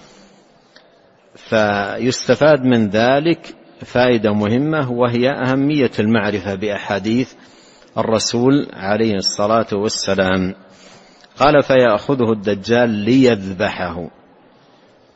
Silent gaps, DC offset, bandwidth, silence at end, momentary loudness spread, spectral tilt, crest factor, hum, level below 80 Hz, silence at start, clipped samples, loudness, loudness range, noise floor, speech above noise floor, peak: none; under 0.1%; 8.8 kHz; 1.05 s; 8 LU; -5.5 dB/octave; 16 dB; none; -48 dBFS; 1.45 s; under 0.1%; -16 LUFS; 3 LU; -51 dBFS; 35 dB; 0 dBFS